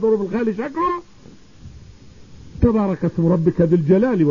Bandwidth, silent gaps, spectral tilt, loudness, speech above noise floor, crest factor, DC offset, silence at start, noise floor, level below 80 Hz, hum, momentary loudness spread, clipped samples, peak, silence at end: 7.2 kHz; none; -10 dB/octave; -19 LUFS; 29 dB; 16 dB; 0.4%; 0 s; -46 dBFS; -38 dBFS; none; 7 LU; under 0.1%; -2 dBFS; 0 s